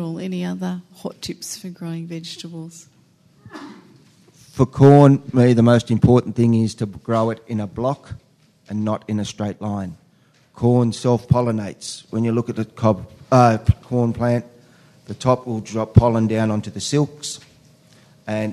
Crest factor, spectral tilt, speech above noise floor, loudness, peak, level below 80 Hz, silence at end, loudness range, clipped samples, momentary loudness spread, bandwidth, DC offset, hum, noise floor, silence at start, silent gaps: 20 dB; -7 dB/octave; 38 dB; -19 LUFS; 0 dBFS; -44 dBFS; 0 s; 14 LU; under 0.1%; 18 LU; 13 kHz; under 0.1%; none; -56 dBFS; 0 s; none